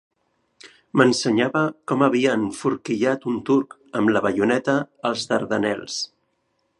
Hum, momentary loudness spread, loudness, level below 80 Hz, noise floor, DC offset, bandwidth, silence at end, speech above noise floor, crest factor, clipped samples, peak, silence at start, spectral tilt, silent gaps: none; 8 LU; -22 LUFS; -64 dBFS; -70 dBFS; under 0.1%; 11.5 kHz; 0.75 s; 49 dB; 22 dB; under 0.1%; -2 dBFS; 0.65 s; -5 dB/octave; none